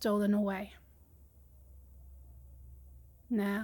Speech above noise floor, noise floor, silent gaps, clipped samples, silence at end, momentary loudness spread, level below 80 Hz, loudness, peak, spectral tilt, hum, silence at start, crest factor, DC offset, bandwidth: 28 dB; -60 dBFS; none; under 0.1%; 0 s; 27 LU; -56 dBFS; -33 LUFS; -22 dBFS; -7 dB/octave; none; 0 s; 16 dB; under 0.1%; 17.5 kHz